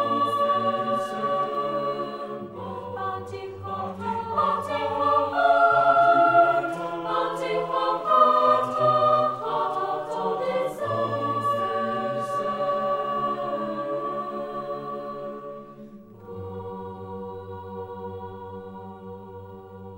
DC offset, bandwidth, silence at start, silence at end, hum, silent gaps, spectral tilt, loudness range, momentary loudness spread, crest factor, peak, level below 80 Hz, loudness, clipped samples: under 0.1%; 16 kHz; 0 s; 0 s; none; none; -6 dB/octave; 16 LU; 20 LU; 20 dB; -6 dBFS; -64 dBFS; -24 LUFS; under 0.1%